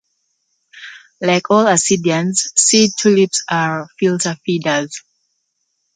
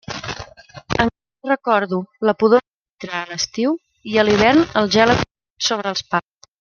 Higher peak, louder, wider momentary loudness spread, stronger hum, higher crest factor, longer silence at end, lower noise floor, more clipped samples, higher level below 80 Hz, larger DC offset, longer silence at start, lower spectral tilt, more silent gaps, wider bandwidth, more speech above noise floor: about the same, 0 dBFS vs 0 dBFS; first, -15 LUFS vs -18 LUFS; first, 19 LU vs 14 LU; neither; about the same, 16 dB vs 18 dB; first, 0.95 s vs 0.4 s; first, -69 dBFS vs -38 dBFS; neither; second, -62 dBFS vs -46 dBFS; neither; first, 0.75 s vs 0.1 s; about the same, -3.5 dB/octave vs -4.5 dB/octave; second, none vs 2.67-2.81 s, 5.31-5.35 s, 5.50-5.54 s; first, 9.6 kHz vs 7.2 kHz; first, 54 dB vs 21 dB